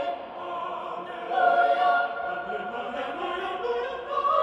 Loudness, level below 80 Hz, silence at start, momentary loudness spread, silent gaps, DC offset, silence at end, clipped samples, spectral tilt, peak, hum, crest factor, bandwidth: -27 LUFS; -66 dBFS; 0 s; 13 LU; none; under 0.1%; 0 s; under 0.1%; -4.5 dB/octave; -10 dBFS; none; 18 dB; 7.8 kHz